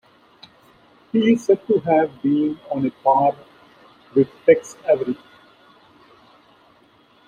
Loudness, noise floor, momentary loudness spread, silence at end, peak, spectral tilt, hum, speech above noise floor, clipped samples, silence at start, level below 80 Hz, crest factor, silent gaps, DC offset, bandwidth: -19 LUFS; -55 dBFS; 7 LU; 2.15 s; -2 dBFS; -7 dB/octave; none; 36 dB; under 0.1%; 1.15 s; -64 dBFS; 20 dB; none; under 0.1%; 10 kHz